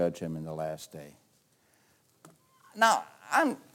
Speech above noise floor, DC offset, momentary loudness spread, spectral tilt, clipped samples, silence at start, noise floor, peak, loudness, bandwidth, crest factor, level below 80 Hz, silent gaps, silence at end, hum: 38 dB; under 0.1%; 21 LU; -4 dB/octave; under 0.1%; 0 s; -68 dBFS; -10 dBFS; -29 LUFS; 17 kHz; 22 dB; -70 dBFS; none; 0.15 s; none